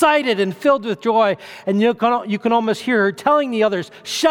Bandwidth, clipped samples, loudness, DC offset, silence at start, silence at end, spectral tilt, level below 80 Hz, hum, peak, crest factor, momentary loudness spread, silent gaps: 18 kHz; under 0.1%; -18 LUFS; under 0.1%; 0 s; 0 s; -4.5 dB/octave; -66 dBFS; none; -2 dBFS; 16 dB; 4 LU; none